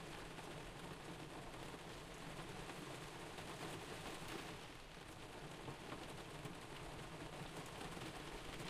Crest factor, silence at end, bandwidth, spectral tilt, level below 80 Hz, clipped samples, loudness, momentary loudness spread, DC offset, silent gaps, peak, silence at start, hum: 16 dB; 0 s; 15.5 kHz; -4 dB/octave; -64 dBFS; under 0.1%; -52 LUFS; 3 LU; under 0.1%; none; -34 dBFS; 0 s; none